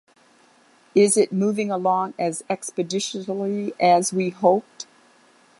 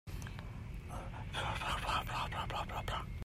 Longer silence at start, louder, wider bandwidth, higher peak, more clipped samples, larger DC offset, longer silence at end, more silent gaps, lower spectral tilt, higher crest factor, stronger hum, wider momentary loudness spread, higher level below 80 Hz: first, 0.95 s vs 0.05 s; first, -22 LUFS vs -40 LUFS; second, 11.5 kHz vs 16 kHz; first, -4 dBFS vs -22 dBFS; neither; neither; first, 0.75 s vs 0 s; neither; about the same, -4.5 dB/octave vs -4.5 dB/octave; about the same, 20 dB vs 18 dB; neither; about the same, 10 LU vs 10 LU; second, -72 dBFS vs -48 dBFS